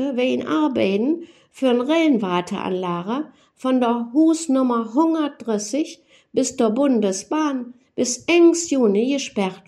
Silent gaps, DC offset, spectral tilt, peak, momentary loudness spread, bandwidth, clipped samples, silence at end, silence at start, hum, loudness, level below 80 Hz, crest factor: none; under 0.1%; -4.5 dB/octave; -6 dBFS; 8 LU; 11.5 kHz; under 0.1%; 0.1 s; 0 s; none; -20 LUFS; -68 dBFS; 14 dB